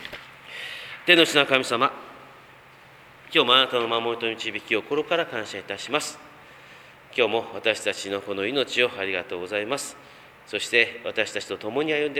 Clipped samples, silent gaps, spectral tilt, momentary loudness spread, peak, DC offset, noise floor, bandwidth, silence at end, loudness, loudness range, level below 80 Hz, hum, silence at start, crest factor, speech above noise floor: under 0.1%; none; -2.5 dB/octave; 16 LU; 0 dBFS; under 0.1%; -50 dBFS; 16.5 kHz; 0 s; -23 LUFS; 6 LU; -68 dBFS; none; 0 s; 26 dB; 25 dB